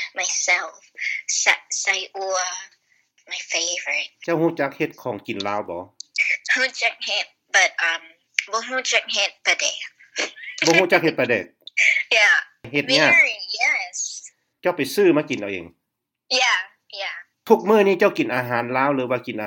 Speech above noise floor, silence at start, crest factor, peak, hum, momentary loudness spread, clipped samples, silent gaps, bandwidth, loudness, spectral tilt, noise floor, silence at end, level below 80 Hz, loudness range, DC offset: 59 dB; 0 s; 22 dB; 0 dBFS; none; 14 LU; under 0.1%; none; 17 kHz; -20 LUFS; -2 dB/octave; -80 dBFS; 0 s; -74 dBFS; 6 LU; under 0.1%